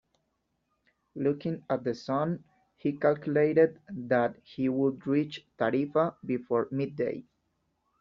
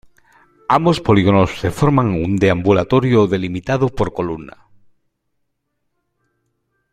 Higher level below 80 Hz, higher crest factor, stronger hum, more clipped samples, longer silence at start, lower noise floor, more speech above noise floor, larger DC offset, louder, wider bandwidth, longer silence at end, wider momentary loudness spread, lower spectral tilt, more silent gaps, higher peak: second, -70 dBFS vs -42 dBFS; about the same, 20 dB vs 18 dB; neither; neither; first, 1.15 s vs 0.7 s; first, -78 dBFS vs -73 dBFS; second, 50 dB vs 58 dB; neither; second, -29 LUFS vs -16 LUFS; second, 7.2 kHz vs 13.5 kHz; second, 0.8 s vs 2.45 s; about the same, 9 LU vs 8 LU; about the same, -6.5 dB/octave vs -7.5 dB/octave; neither; second, -10 dBFS vs 0 dBFS